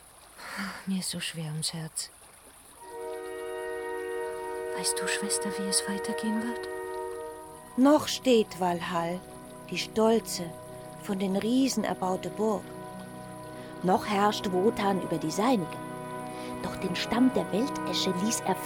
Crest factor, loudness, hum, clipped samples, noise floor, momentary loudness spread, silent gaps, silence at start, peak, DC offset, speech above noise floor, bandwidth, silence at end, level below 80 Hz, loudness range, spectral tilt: 20 dB; -29 LUFS; none; under 0.1%; -53 dBFS; 16 LU; none; 0 s; -10 dBFS; under 0.1%; 25 dB; 18.5 kHz; 0 s; -62 dBFS; 7 LU; -4 dB/octave